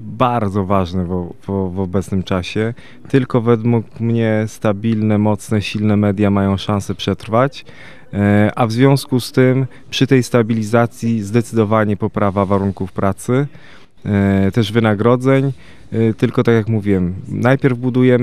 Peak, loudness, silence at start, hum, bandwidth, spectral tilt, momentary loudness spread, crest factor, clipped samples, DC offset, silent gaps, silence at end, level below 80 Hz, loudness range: 0 dBFS; -16 LUFS; 0 s; none; 14.5 kHz; -7 dB/octave; 7 LU; 16 dB; under 0.1%; 1%; none; 0 s; -50 dBFS; 3 LU